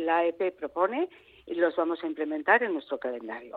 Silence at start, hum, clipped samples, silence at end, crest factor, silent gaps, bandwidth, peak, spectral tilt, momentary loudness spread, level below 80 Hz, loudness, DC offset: 0 s; none; under 0.1%; 0 s; 22 dB; none; 4.6 kHz; -8 dBFS; -7 dB/octave; 11 LU; -72 dBFS; -28 LUFS; under 0.1%